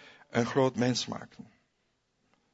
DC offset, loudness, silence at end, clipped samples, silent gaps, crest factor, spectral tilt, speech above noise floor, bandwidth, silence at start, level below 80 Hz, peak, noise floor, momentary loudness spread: under 0.1%; -30 LUFS; 1.1 s; under 0.1%; none; 22 dB; -5 dB/octave; 46 dB; 8 kHz; 0.05 s; -70 dBFS; -12 dBFS; -76 dBFS; 14 LU